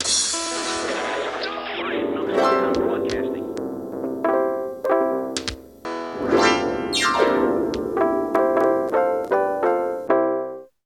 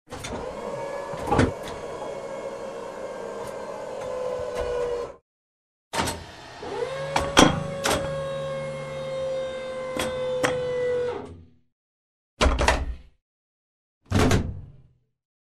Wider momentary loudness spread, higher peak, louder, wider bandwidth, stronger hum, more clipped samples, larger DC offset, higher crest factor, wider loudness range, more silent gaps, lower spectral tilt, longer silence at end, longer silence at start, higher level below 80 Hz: second, 10 LU vs 13 LU; second, -4 dBFS vs 0 dBFS; first, -22 LUFS vs -27 LUFS; first, 16 kHz vs 13.5 kHz; neither; neither; neither; second, 18 dB vs 26 dB; second, 4 LU vs 7 LU; second, none vs 5.22-5.91 s, 11.72-12.37 s, 13.22-14.01 s; second, -3 dB/octave vs -4.5 dB/octave; second, 0.2 s vs 0.65 s; about the same, 0 s vs 0.1 s; second, -52 dBFS vs -38 dBFS